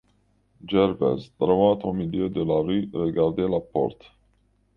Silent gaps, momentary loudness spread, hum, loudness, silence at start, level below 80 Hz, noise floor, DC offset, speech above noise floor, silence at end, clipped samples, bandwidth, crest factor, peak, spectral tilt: none; 7 LU; 50 Hz at -45 dBFS; -24 LUFS; 0.65 s; -52 dBFS; -65 dBFS; under 0.1%; 42 dB; 0.85 s; under 0.1%; 5.6 kHz; 18 dB; -6 dBFS; -9.5 dB/octave